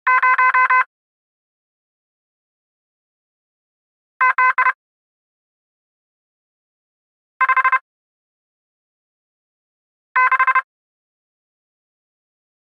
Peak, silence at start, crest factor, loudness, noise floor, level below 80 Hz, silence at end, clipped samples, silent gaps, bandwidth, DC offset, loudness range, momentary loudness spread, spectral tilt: -6 dBFS; 0.05 s; 16 dB; -16 LUFS; under -90 dBFS; under -90 dBFS; 2.2 s; under 0.1%; 0.86-4.20 s, 4.75-7.40 s, 7.81-10.15 s; 6 kHz; under 0.1%; 3 LU; 8 LU; 0 dB/octave